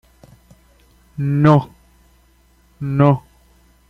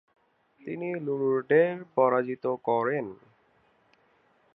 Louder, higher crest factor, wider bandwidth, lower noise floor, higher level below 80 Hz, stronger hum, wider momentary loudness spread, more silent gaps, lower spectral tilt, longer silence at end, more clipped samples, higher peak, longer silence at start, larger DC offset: first, -17 LUFS vs -27 LUFS; about the same, 18 dB vs 18 dB; first, 6 kHz vs 4.8 kHz; second, -54 dBFS vs -66 dBFS; first, -50 dBFS vs -78 dBFS; first, 60 Hz at -50 dBFS vs none; first, 20 LU vs 13 LU; neither; about the same, -9.5 dB/octave vs -10 dB/octave; second, 0.7 s vs 1.4 s; neither; first, -2 dBFS vs -10 dBFS; first, 1.2 s vs 0.65 s; neither